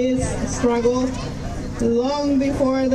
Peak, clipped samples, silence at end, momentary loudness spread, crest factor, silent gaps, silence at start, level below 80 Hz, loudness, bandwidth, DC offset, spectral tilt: -6 dBFS; under 0.1%; 0 s; 10 LU; 14 dB; none; 0 s; -34 dBFS; -21 LUFS; 12 kHz; under 0.1%; -6 dB/octave